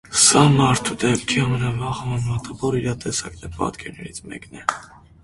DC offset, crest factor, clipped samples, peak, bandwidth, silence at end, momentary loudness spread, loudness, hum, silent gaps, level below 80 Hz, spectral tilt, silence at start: under 0.1%; 20 dB; under 0.1%; 0 dBFS; 11.5 kHz; 0.4 s; 21 LU; -20 LUFS; none; none; -44 dBFS; -4 dB/octave; 0.1 s